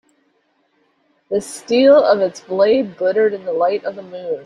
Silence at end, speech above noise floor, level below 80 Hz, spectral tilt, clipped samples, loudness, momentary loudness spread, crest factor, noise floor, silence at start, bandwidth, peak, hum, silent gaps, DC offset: 0 s; 47 dB; -64 dBFS; -4.5 dB/octave; under 0.1%; -16 LUFS; 13 LU; 16 dB; -63 dBFS; 1.3 s; 12 kHz; -2 dBFS; none; none; under 0.1%